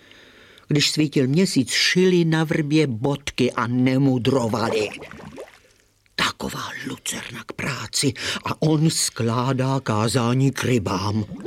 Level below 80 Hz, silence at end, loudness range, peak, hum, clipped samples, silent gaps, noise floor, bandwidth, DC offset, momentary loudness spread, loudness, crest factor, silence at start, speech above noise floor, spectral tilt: -54 dBFS; 0 s; 7 LU; -6 dBFS; none; under 0.1%; none; -59 dBFS; 16.5 kHz; under 0.1%; 11 LU; -21 LUFS; 16 dB; 0.7 s; 38 dB; -5 dB/octave